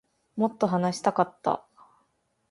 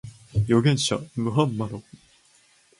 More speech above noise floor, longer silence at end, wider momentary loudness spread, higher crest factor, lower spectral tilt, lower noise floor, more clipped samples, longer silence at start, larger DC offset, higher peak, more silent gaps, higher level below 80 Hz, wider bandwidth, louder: first, 46 dB vs 36 dB; about the same, 0.9 s vs 1 s; second, 6 LU vs 12 LU; about the same, 22 dB vs 18 dB; about the same, -6.5 dB/octave vs -5.5 dB/octave; first, -72 dBFS vs -59 dBFS; neither; first, 0.35 s vs 0.05 s; neither; about the same, -8 dBFS vs -6 dBFS; neither; second, -70 dBFS vs -50 dBFS; about the same, 11.5 kHz vs 11.5 kHz; second, -27 LUFS vs -24 LUFS